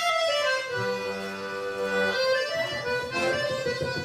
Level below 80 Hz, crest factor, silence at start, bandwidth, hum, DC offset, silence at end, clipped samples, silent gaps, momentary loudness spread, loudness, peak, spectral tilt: -64 dBFS; 14 dB; 0 s; 15.5 kHz; none; under 0.1%; 0 s; under 0.1%; none; 8 LU; -27 LUFS; -14 dBFS; -3 dB/octave